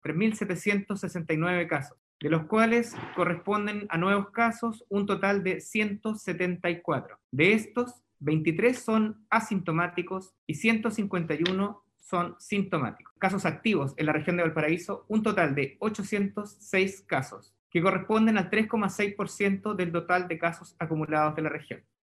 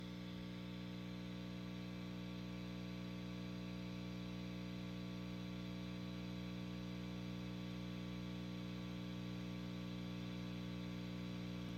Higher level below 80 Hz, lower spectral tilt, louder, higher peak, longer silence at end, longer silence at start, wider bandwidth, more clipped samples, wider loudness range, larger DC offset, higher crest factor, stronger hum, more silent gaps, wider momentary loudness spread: second, -70 dBFS vs -62 dBFS; about the same, -6 dB/octave vs -6.5 dB/octave; first, -28 LUFS vs -48 LUFS; first, -8 dBFS vs -36 dBFS; first, 0.25 s vs 0 s; about the same, 0.05 s vs 0 s; second, 13 kHz vs 15.5 kHz; neither; about the same, 2 LU vs 1 LU; neither; first, 20 dB vs 12 dB; second, none vs 60 Hz at -50 dBFS; first, 1.98-2.20 s, 7.24-7.29 s, 10.38-10.47 s, 13.11-13.16 s, 17.59-17.70 s vs none; first, 9 LU vs 2 LU